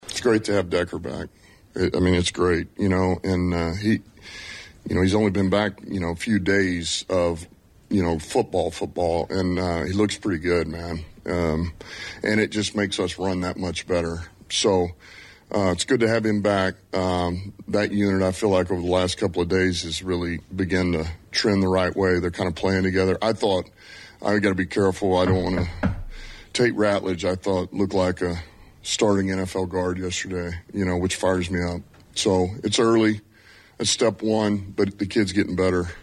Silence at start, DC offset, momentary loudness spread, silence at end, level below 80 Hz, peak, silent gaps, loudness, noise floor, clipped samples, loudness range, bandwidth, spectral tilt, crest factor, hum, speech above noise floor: 0.05 s; under 0.1%; 10 LU; 0 s; -44 dBFS; -8 dBFS; none; -23 LUFS; -51 dBFS; under 0.1%; 2 LU; 13 kHz; -5 dB/octave; 14 dB; none; 29 dB